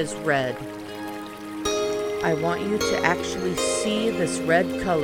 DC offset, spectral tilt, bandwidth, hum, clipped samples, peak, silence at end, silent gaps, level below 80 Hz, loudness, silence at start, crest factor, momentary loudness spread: under 0.1%; -4 dB/octave; 19 kHz; none; under 0.1%; -4 dBFS; 0 s; none; -50 dBFS; -24 LUFS; 0 s; 20 dB; 12 LU